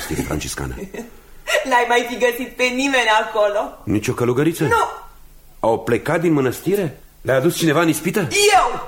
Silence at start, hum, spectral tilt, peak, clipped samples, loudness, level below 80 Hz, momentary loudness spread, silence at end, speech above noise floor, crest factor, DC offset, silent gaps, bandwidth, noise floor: 0 s; none; -4.5 dB/octave; -4 dBFS; under 0.1%; -18 LUFS; -42 dBFS; 12 LU; 0 s; 25 dB; 16 dB; under 0.1%; none; 17 kHz; -43 dBFS